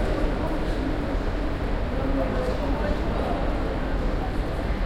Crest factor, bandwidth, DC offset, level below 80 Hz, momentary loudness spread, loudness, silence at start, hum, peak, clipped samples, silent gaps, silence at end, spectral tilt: 14 dB; 11 kHz; under 0.1%; -28 dBFS; 2 LU; -28 LUFS; 0 s; none; -12 dBFS; under 0.1%; none; 0 s; -7.5 dB/octave